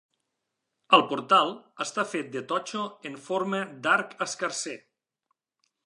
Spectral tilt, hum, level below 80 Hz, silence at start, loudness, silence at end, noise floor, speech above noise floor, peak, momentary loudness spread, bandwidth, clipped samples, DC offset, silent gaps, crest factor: -3 dB/octave; none; -84 dBFS; 0.9 s; -27 LUFS; 1.1 s; -82 dBFS; 55 dB; -4 dBFS; 13 LU; 11.5 kHz; under 0.1%; under 0.1%; none; 26 dB